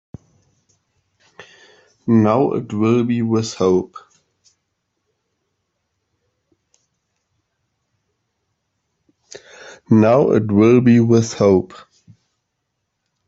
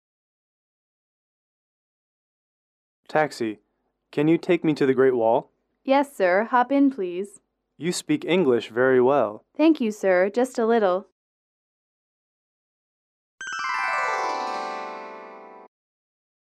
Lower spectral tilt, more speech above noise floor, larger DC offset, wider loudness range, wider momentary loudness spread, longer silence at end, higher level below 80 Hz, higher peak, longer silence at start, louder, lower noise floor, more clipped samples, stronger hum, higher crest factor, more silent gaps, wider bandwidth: first, -7.5 dB/octave vs -5.5 dB/octave; first, 60 dB vs 22 dB; neither; about the same, 8 LU vs 10 LU; second, 8 LU vs 14 LU; first, 1.5 s vs 1 s; first, -58 dBFS vs -76 dBFS; first, -2 dBFS vs -8 dBFS; second, 1.4 s vs 3.1 s; first, -15 LUFS vs -23 LUFS; first, -75 dBFS vs -43 dBFS; neither; neither; about the same, 18 dB vs 18 dB; second, none vs 11.12-13.38 s; second, 7.8 kHz vs 13.5 kHz